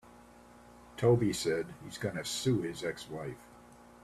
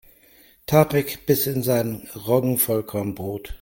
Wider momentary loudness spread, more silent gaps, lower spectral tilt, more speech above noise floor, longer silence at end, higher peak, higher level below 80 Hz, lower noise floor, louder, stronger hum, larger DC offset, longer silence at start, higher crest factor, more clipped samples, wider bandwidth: first, 15 LU vs 12 LU; neither; about the same, -5.5 dB/octave vs -5.5 dB/octave; second, 24 dB vs 32 dB; first, 0.2 s vs 0.05 s; second, -14 dBFS vs -2 dBFS; second, -62 dBFS vs -48 dBFS; about the same, -56 dBFS vs -54 dBFS; second, -33 LUFS vs -22 LUFS; first, 60 Hz at -50 dBFS vs none; neither; second, 0.05 s vs 0.7 s; about the same, 20 dB vs 20 dB; neither; second, 14.5 kHz vs 17 kHz